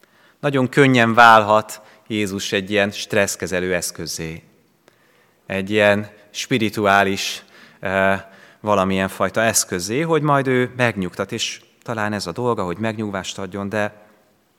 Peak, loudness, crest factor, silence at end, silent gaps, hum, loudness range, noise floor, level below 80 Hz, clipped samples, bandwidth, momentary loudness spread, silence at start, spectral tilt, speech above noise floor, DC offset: 0 dBFS; -19 LUFS; 20 dB; 0.7 s; none; none; 7 LU; -57 dBFS; -62 dBFS; under 0.1%; 18 kHz; 14 LU; 0.45 s; -4 dB/octave; 38 dB; under 0.1%